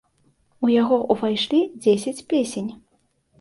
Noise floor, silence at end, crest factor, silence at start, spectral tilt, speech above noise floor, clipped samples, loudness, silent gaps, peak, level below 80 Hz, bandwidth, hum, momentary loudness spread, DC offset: -66 dBFS; 0.65 s; 18 dB; 0.6 s; -5 dB/octave; 46 dB; under 0.1%; -21 LUFS; none; -6 dBFS; -64 dBFS; 11.5 kHz; none; 8 LU; under 0.1%